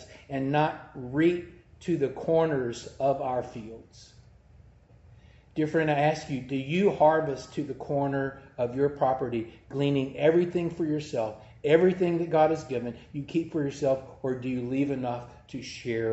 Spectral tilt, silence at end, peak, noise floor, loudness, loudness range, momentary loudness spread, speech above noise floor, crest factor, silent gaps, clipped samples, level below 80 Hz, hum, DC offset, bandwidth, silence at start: -7 dB/octave; 0 s; -8 dBFS; -55 dBFS; -28 LUFS; 5 LU; 13 LU; 28 dB; 20 dB; none; under 0.1%; -60 dBFS; none; under 0.1%; 8.2 kHz; 0 s